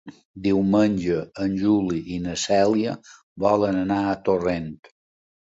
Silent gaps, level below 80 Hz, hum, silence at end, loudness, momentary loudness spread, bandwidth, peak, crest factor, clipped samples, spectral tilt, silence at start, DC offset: 0.25-0.34 s, 3.23-3.36 s; -50 dBFS; none; 0.75 s; -23 LUFS; 9 LU; 8 kHz; -6 dBFS; 18 dB; under 0.1%; -6 dB/octave; 0.05 s; under 0.1%